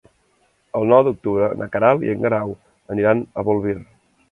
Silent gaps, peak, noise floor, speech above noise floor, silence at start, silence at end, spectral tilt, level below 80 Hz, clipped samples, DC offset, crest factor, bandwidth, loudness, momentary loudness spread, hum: none; 0 dBFS; -62 dBFS; 44 dB; 0.75 s; 0.5 s; -9.5 dB/octave; -52 dBFS; under 0.1%; under 0.1%; 20 dB; 3.9 kHz; -19 LUFS; 13 LU; none